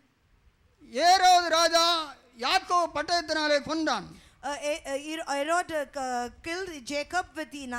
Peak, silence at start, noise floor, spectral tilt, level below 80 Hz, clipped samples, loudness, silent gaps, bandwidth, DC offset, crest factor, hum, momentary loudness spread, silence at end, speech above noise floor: -14 dBFS; 0.9 s; -64 dBFS; -1.5 dB/octave; -60 dBFS; under 0.1%; -26 LUFS; none; 18.5 kHz; under 0.1%; 14 dB; none; 14 LU; 0 s; 35 dB